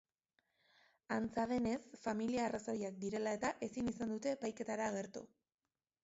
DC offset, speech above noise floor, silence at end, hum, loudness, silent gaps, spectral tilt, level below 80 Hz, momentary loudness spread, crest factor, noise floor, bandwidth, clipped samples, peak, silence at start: under 0.1%; over 50 dB; 0.75 s; none; -41 LUFS; none; -5 dB/octave; -70 dBFS; 5 LU; 16 dB; under -90 dBFS; 7.6 kHz; under 0.1%; -26 dBFS; 1.1 s